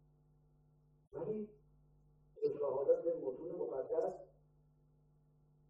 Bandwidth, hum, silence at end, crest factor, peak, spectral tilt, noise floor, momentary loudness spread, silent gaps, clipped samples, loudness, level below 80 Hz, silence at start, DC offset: 5.4 kHz; none; 1.45 s; 20 dB; -22 dBFS; -9 dB/octave; -71 dBFS; 14 LU; none; under 0.1%; -39 LUFS; -76 dBFS; 1.15 s; under 0.1%